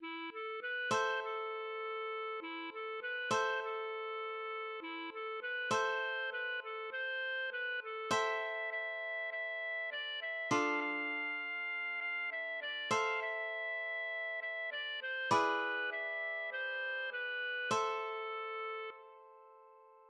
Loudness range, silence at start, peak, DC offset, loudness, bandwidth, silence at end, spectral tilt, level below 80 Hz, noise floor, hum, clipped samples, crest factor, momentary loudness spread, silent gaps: 3 LU; 0 s; -18 dBFS; under 0.1%; -38 LUFS; 11.5 kHz; 0 s; -2.5 dB/octave; -86 dBFS; -61 dBFS; none; under 0.1%; 20 dB; 8 LU; none